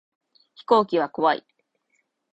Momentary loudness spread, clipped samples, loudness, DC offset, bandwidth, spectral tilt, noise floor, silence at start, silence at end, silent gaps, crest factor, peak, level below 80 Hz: 10 LU; under 0.1%; -22 LUFS; under 0.1%; 8.2 kHz; -6.5 dB/octave; -72 dBFS; 0.7 s; 0.95 s; none; 22 dB; -4 dBFS; -72 dBFS